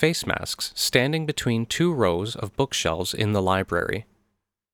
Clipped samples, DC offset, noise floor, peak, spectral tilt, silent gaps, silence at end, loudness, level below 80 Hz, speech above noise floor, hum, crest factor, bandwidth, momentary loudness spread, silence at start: under 0.1%; under 0.1%; -76 dBFS; 0 dBFS; -4.5 dB/octave; none; 0.7 s; -24 LUFS; -50 dBFS; 52 dB; none; 24 dB; 19.5 kHz; 6 LU; 0 s